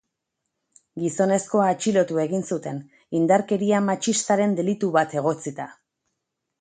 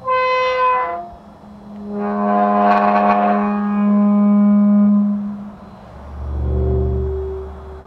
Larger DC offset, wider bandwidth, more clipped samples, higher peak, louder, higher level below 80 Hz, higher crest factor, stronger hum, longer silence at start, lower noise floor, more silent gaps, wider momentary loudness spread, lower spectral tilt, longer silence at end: neither; first, 9.4 kHz vs 6 kHz; neither; second, -6 dBFS vs -2 dBFS; second, -23 LUFS vs -16 LUFS; second, -70 dBFS vs -30 dBFS; about the same, 18 dB vs 16 dB; neither; first, 0.95 s vs 0 s; first, -81 dBFS vs -39 dBFS; neither; second, 13 LU vs 19 LU; second, -5 dB/octave vs -9.5 dB/octave; first, 0.9 s vs 0.05 s